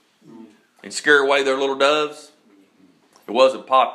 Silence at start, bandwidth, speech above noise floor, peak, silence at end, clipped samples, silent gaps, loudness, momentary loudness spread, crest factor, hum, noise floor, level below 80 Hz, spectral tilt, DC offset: 0.4 s; 12 kHz; 38 dB; -2 dBFS; 0 s; under 0.1%; none; -18 LUFS; 11 LU; 18 dB; none; -56 dBFS; -80 dBFS; -2 dB/octave; under 0.1%